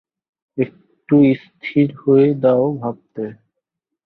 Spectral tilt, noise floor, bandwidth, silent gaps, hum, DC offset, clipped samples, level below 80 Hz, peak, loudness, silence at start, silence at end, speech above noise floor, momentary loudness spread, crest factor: -11 dB/octave; -79 dBFS; 4.5 kHz; none; none; under 0.1%; under 0.1%; -62 dBFS; -2 dBFS; -17 LUFS; 0.55 s; 0.7 s; 62 dB; 16 LU; 16 dB